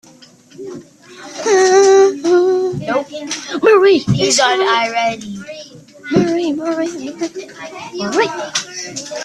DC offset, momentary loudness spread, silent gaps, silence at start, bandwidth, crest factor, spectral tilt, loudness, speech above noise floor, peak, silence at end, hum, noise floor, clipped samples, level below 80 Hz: under 0.1%; 21 LU; none; 0.6 s; 11.5 kHz; 16 dB; -4 dB/octave; -14 LUFS; 27 dB; 0 dBFS; 0 s; none; -44 dBFS; under 0.1%; -54 dBFS